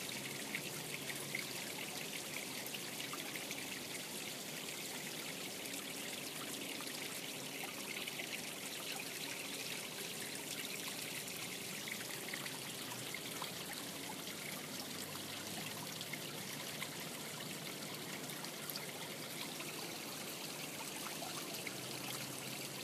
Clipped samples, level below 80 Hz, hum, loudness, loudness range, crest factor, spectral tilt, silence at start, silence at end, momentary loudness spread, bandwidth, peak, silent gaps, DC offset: under 0.1%; -82 dBFS; none; -43 LUFS; 1 LU; 24 dB; -2 dB/octave; 0 s; 0 s; 2 LU; 15.5 kHz; -22 dBFS; none; under 0.1%